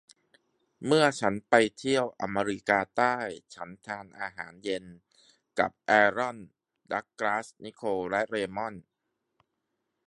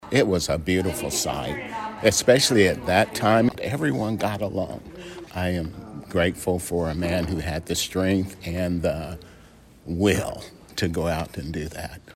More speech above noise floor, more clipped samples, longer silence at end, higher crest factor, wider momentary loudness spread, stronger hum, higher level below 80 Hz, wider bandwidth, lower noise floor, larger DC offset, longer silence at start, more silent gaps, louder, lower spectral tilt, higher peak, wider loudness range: first, 53 dB vs 26 dB; neither; first, 1.25 s vs 0.05 s; about the same, 26 dB vs 22 dB; about the same, 15 LU vs 14 LU; neither; second, -68 dBFS vs -44 dBFS; second, 11.5 kHz vs 16 kHz; first, -82 dBFS vs -50 dBFS; neither; first, 0.8 s vs 0 s; neither; second, -28 LUFS vs -24 LUFS; about the same, -4.5 dB/octave vs -4.5 dB/octave; about the same, -4 dBFS vs -2 dBFS; about the same, 7 LU vs 6 LU